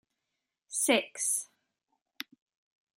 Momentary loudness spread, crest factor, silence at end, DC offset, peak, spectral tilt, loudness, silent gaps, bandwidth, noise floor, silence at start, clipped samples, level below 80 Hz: 18 LU; 24 dB; 1.5 s; under 0.1%; -12 dBFS; -0.5 dB/octave; -29 LUFS; none; 16 kHz; -86 dBFS; 0.7 s; under 0.1%; under -90 dBFS